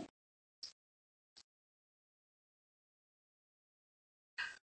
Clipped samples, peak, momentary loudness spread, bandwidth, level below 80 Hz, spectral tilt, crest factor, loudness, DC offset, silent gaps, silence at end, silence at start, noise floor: under 0.1%; -30 dBFS; 20 LU; 8.4 kHz; under -90 dBFS; -1 dB/octave; 28 dB; -50 LUFS; under 0.1%; 0.10-0.62 s, 0.72-1.36 s, 1.44-4.37 s; 0.05 s; 0 s; under -90 dBFS